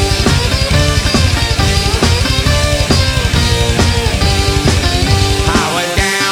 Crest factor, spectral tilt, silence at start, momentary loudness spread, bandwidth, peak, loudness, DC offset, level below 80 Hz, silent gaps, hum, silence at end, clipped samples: 12 dB; -4 dB/octave; 0 s; 1 LU; 17 kHz; 0 dBFS; -12 LUFS; under 0.1%; -18 dBFS; none; none; 0 s; under 0.1%